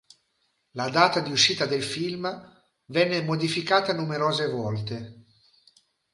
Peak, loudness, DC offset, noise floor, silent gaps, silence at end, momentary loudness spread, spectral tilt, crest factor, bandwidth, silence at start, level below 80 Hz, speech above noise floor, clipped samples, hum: -4 dBFS; -25 LUFS; under 0.1%; -73 dBFS; none; 0.95 s; 14 LU; -4 dB/octave; 22 dB; 11.5 kHz; 0.75 s; -66 dBFS; 47 dB; under 0.1%; none